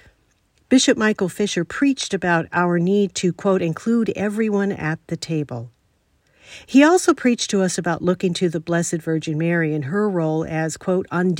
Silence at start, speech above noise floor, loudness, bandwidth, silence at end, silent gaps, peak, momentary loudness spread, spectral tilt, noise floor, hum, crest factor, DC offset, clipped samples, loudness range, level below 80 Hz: 0.7 s; 44 dB; -20 LUFS; 16 kHz; 0 s; none; -2 dBFS; 8 LU; -5 dB/octave; -63 dBFS; none; 18 dB; under 0.1%; under 0.1%; 3 LU; -58 dBFS